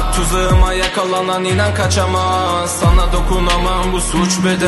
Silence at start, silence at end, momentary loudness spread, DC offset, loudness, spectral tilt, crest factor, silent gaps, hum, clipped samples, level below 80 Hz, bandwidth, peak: 0 s; 0 s; 3 LU; under 0.1%; -15 LUFS; -4.5 dB/octave; 12 dB; none; none; under 0.1%; -18 dBFS; 12.5 kHz; 0 dBFS